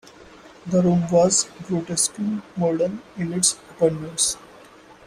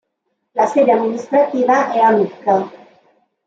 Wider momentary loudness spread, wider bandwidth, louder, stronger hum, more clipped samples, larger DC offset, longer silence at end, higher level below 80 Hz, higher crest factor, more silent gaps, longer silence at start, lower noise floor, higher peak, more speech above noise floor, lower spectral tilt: first, 10 LU vs 6 LU; first, 15.5 kHz vs 8 kHz; second, -21 LUFS vs -15 LUFS; neither; neither; neither; second, 0.15 s vs 0.7 s; first, -56 dBFS vs -70 dBFS; about the same, 18 dB vs 14 dB; neither; second, 0.2 s vs 0.55 s; second, -47 dBFS vs -72 dBFS; about the same, -4 dBFS vs -2 dBFS; second, 26 dB vs 57 dB; second, -4.5 dB/octave vs -6 dB/octave